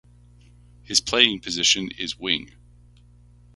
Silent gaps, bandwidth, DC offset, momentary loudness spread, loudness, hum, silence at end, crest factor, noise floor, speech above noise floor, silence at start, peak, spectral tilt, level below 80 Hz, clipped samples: none; 12 kHz; under 0.1%; 9 LU; -21 LUFS; 60 Hz at -50 dBFS; 1.1 s; 26 dB; -52 dBFS; 29 dB; 0.9 s; 0 dBFS; -1 dB/octave; -52 dBFS; under 0.1%